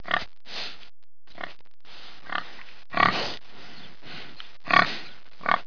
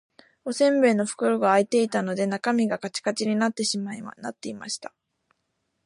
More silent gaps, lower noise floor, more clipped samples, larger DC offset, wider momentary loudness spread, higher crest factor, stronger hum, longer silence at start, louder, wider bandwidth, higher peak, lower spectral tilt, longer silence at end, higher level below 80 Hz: neither; second, -51 dBFS vs -76 dBFS; neither; first, 2% vs under 0.1%; first, 24 LU vs 15 LU; first, 28 dB vs 18 dB; neither; second, 0.05 s vs 0.45 s; about the same, -26 LUFS vs -24 LUFS; second, 5.4 kHz vs 11.5 kHz; first, -2 dBFS vs -8 dBFS; about the same, -4 dB/octave vs -4.5 dB/octave; second, 0.05 s vs 0.95 s; first, -60 dBFS vs -74 dBFS